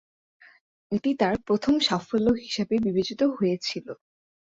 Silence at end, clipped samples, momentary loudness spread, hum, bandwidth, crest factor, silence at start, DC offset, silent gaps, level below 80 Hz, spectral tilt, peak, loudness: 0.65 s; under 0.1%; 9 LU; none; 8 kHz; 18 dB; 0.9 s; under 0.1%; none; -56 dBFS; -5.5 dB/octave; -10 dBFS; -25 LUFS